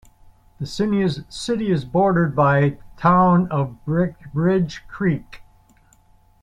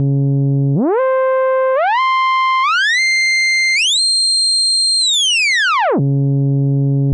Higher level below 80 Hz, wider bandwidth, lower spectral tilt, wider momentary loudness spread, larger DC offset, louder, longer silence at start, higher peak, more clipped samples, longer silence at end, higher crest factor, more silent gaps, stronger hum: first, -48 dBFS vs -78 dBFS; about the same, 10.5 kHz vs 11.5 kHz; first, -7.5 dB/octave vs -3.5 dB/octave; first, 10 LU vs 4 LU; neither; second, -20 LUFS vs -12 LUFS; first, 0.6 s vs 0 s; about the same, -4 dBFS vs -6 dBFS; neither; first, 1 s vs 0 s; first, 18 dB vs 8 dB; neither; neither